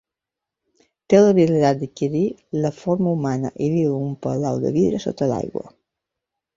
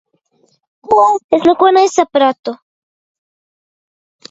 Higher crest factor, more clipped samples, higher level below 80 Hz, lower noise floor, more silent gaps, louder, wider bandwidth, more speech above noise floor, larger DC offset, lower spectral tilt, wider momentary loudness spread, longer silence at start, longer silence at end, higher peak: first, 20 dB vs 14 dB; neither; about the same, -56 dBFS vs -60 dBFS; first, -86 dBFS vs -58 dBFS; second, none vs 1.24-1.29 s, 2.39-2.43 s; second, -20 LUFS vs -11 LUFS; about the same, 7.6 kHz vs 8 kHz; first, 67 dB vs 47 dB; neither; first, -7.5 dB/octave vs -3.5 dB/octave; second, 10 LU vs 15 LU; first, 1.1 s vs 0.9 s; second, 0.9 s vs 1.75 s; about the same, -2 dBFS vs 0 dBFS